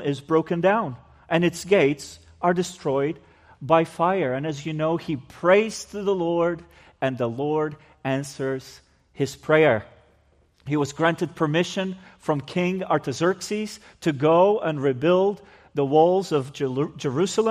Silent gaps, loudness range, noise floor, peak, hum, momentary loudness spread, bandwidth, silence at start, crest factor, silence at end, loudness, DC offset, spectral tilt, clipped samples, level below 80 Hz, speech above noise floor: none; 4 LU; -61 dBFS; -4 dBFS; none; 12 LU; 15 kHz; 0 s; 20 dB; 0 s; -23 LUFS; under 0.1%; -6 dB/octave; under 0.1%; -60 dBFS; 38 dB